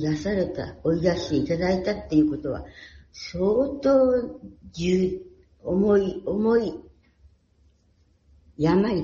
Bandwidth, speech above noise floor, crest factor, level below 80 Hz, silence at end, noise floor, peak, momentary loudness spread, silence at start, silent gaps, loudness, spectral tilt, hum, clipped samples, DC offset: 7.2 kHz; 39 dB; 16 dB; -48 dBFS; 0 s; -62 dBFS; -8 dBFS; 17 LU; 0 s; none; -24 LUFS; -7 dB/octave; none; under 0.1%; under 0.1%